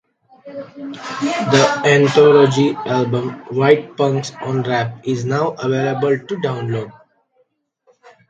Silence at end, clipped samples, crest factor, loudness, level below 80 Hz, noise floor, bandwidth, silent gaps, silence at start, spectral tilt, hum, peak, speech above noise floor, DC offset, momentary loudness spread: 1.4 s; under 0.1%; 18 dB; -16 LUFS; -60 dBFS; -63 dBFS; 9 kHz; none; 0.45 s; -6 dB/octave; none; 0 dBFS; 47 dB; under 0.1%; 17 LU